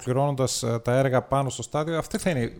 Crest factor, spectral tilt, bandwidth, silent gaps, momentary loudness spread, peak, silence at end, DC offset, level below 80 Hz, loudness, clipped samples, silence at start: 16 dB; -5.5 dB/octave; 18 kHz; none; 5 LU; -10 dBFS; 0 s; under 0.1%; -50 dBFS; -25 LUFS; under 0.1%; 0 s